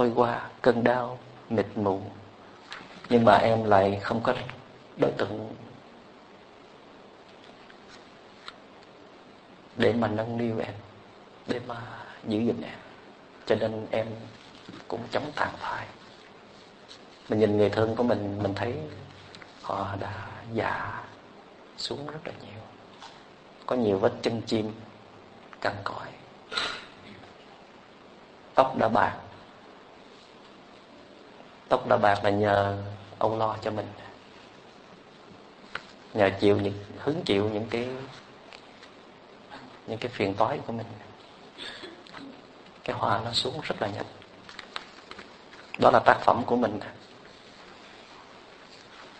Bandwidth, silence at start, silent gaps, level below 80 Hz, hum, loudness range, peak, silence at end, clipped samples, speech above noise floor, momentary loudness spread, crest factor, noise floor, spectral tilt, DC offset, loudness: 9.2 kHz; 0 s; none; -62 dBFS; none; 10 LU; -2 dBFS; 0 s; under 0.1%; 25 dB; 26 LU; 28 dB; -51 dBFS; -6 dB/octave; under 0.1%; -27 LUFS